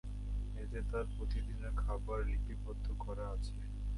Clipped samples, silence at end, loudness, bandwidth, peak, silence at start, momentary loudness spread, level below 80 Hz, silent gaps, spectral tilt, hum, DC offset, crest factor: under 0.1%; 0 s; -42 LUFS; 11 kHz; -26 dBFS; 0.05 s; 4 LU; -40 dBFS; none; -7.5 dB/octave; none; under 0.1%; 12 dB